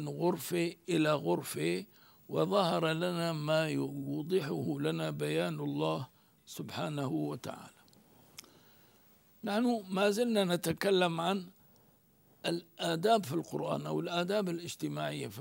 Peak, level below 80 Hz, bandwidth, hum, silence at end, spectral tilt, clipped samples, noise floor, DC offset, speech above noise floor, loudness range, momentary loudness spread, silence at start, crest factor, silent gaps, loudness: -14 dBFS; -76 dBFS; 16 kHz; none; 0 s; -5.5 dB/octave; under 0.1%; -66 dBFS; under 0.1%; 33 dB; 6 LU; 12 LU; 0 s; 18 dB; none; -33 LUFS